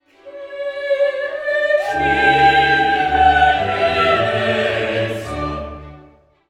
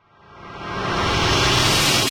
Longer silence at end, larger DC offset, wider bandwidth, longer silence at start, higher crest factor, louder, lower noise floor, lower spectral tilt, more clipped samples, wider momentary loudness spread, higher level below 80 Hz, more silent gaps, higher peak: first, 0.5 s vs 0 s; neither; second, 12 kHz vs 16.5 kHz; about the same, 0.25 s vs 0.35 s; about the same, 16 dB vs 16 dB; about the same, -16 LUFS vs -17 LUFS; first, -48 dBFS vs -43 dBFS; first, -5 dB/octave vs -3 dB/octave; neither; about the same, 15 LU vs 17 LU; about the same, -38 dBFS vs -34 dBFS; neither; first, 0 dBFS vs -4 dBFS